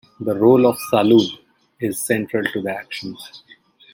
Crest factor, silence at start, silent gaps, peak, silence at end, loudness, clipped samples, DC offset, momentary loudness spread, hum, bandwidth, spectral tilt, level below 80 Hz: 18 dB; 0.2 s; none; -2 dBFS; 0.55 s; -18 LUFS; under 0.1%; under 0.1%; 19 LU; none; 17 kHz; -5 dB/octave; -62 dBFS